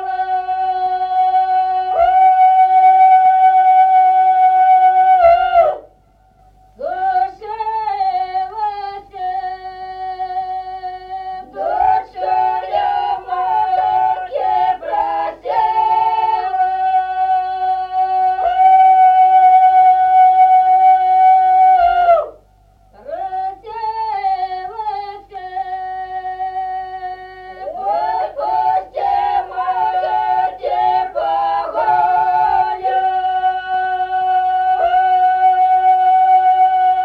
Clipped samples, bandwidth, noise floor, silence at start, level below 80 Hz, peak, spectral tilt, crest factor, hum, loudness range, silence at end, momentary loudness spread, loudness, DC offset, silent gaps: under 0.1%; 4.9 kHz; -51 dBFS; 0 s; -50 dBFS; -2 dBFS; -4.5 dB/octave; 12 dB; none; 13 LU; 0 s; 15 LU; -14 LUFS; under 0.1%; none